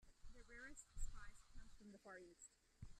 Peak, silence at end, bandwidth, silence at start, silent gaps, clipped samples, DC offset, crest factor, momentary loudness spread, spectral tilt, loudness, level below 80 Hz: -36 dBFS; 0 s; 12 kHz; 0 s; none; under 0.1%; under 0.1%; 20 dB; 10 LU; -3.5 dB/octave; -62 LUFS; -58 dBFS